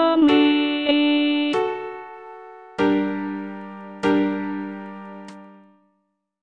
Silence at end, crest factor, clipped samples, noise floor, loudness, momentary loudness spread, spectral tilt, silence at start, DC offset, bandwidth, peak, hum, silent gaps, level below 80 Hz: 0.9 s; 16 dB; under 0.1%; -72 dBFS; -21 LUFS; 22 LU; -6 dB/octave; 0 s; under 0.1%; 7.4 kHz; -6 dBFS; none; none; -62 dBFS